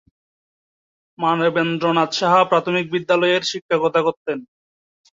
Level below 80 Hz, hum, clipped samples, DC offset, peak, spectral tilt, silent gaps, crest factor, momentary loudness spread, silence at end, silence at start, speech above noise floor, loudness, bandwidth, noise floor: -66 dBFS; none; under 0.1%; under 0.1%; -2 dBFS; -5 dB/octave; 3.62-3.69 s, 4.17-4.25 s; 18 dB; 7 LU; 0.7 s; 1.2 s; over 72 dB; -19 LUFS; 7.8 kHz; under -90 dBFS